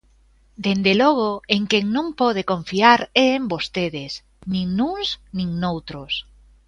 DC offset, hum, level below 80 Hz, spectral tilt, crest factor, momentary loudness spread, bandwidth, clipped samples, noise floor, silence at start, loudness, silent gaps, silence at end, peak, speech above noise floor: under 0.1%; none; -50 dBFS; -5.5 dB/octave; 20 dB; 12 LU; 10.5 kHz; under 0.1%; -56 dBFS; 0.6 s; -20 LUFS; none; 0.45 s; 0 dBFS; 36 dB